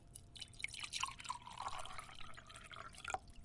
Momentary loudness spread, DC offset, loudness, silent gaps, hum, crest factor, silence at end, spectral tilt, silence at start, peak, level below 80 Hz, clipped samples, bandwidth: 12 LU; under 0.1%; -48 LUFS; none; none; 24 dB; 0 s; -1 dB/octave; 0 s; -24 dBFS; -64 dBFS; under 0.1%; 11.5 kHz